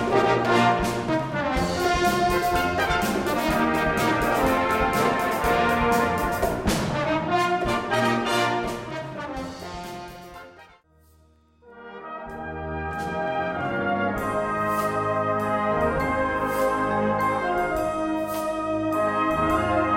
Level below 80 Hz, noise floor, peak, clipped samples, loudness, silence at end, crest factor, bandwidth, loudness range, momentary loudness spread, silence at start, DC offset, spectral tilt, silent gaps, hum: -42 dBFS; -58 dBFS; -6 dBFS; under 0.1%; -24 LUFS; 0 s; 18 dB; 16.5 kHz; 12 LU; 12 LU; 0 s; under 0.1%; -5 dB/octave; none; none